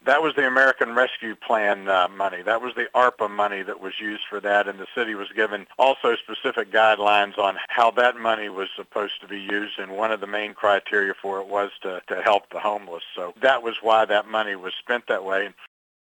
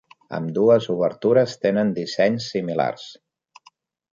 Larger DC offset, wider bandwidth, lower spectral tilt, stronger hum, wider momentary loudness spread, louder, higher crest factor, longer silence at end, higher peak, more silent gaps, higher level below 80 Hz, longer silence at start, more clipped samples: neither; first, 18 kHz vs 7.6 kHz; second, -3.5 dB/octave vs -6.5 dB/octave; neither; about the same, 11 LU vs 12 LU; about the same, -23 LUFS vs -21 LUFS; about the same, 20 dB vs 18 dB; second, 0.35 s vs 1 s; about the same, -4 dBFS vs -4 dBFS; neither; second, -76 dBFS vs -66 dBFS; second, 0.05 s vs 0.3 s; neither